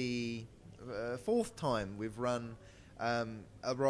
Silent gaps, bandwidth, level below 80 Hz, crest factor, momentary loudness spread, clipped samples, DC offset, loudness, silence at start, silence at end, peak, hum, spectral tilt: none; 11 kHz; -62 dBFS; 18 dB; 16 LU; under 0.1%; under 0.1%; -38 LUFS; 0 s; 0 s; -20 dBFS; none; -5.5 dB/octave